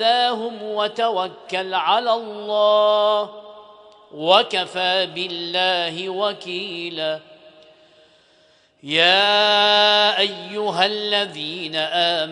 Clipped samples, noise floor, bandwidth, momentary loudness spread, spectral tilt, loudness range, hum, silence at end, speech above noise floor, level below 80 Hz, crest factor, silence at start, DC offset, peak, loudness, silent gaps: under 0.1%; -57 dBFS; 10.5 kHz; 12 LU; -3 dB/octave; 8 LU; none; 0 s; 37 dB; -74 dBFS; 20 dB; 0 s; under 0.1%; 0 dBFS; -19 LUFS; none